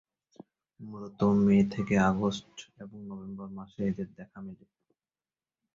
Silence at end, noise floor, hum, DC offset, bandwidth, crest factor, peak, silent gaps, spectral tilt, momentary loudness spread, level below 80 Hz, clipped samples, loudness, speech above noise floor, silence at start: 1.2 s; under -90 dBFS; none; under 0.1%; 7.6 kHz; 18 dB; -12 dBFS; none; -7.5 dB/octave; 22 LU; -58 dBFS; under 0.1%; -28 LUFS; over 60 dB; 0.8 s